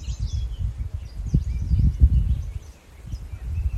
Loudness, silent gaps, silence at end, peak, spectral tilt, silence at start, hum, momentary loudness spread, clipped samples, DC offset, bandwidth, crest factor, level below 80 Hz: -25 LUFS; none; 0 s; -4 dBFS; -7.5 dB/octave; 0 s; none; 18 LU; under 0.1%; under 0.1%; 7.6 kHz; 20 dB; -26 dBFS